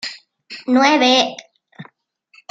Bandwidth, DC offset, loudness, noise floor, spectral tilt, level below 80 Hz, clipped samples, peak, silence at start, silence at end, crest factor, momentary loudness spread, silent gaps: 8 kHz; under 0.1%; -14 LUFS; -57 dBFS; -2.5 dB/octave; -70 dBFS; under 0.1%; -2 dBFS; 0.05 s; 0.7 s; 18 dB; 22 LU; none